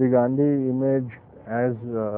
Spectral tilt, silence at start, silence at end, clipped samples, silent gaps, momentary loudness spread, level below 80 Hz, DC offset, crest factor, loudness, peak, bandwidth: -13.5 dB/octave; 0 s; 0 s; under 0.1%; none; 12 LU; -60 dBFS; under 0.1%; 14 dB; -23 LUFS; -8 dBFS; 3.1 kHz